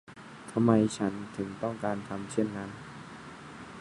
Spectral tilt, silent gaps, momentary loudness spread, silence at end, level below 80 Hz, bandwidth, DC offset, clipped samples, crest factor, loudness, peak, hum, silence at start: -6.5 dB/octave; none; 20 LU; 0 s; -62 dBFS; 11.5 kHz; under 0.1%; under 0.1%; 24 dB; -31 LUFS; -8 dBFS; none; 0.1 s